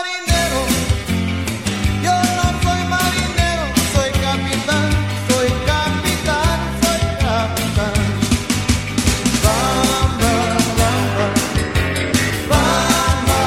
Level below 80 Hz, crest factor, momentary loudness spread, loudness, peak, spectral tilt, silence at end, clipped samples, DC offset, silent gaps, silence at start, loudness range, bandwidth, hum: -26 dBFS; 16 dB; 3 LU; -17 LUFS; -2 dBFS; -4 dB/octave; 0 s; under 0.1%; 0.3%; none; 0 s; 1 LU; 16.5 kHz; none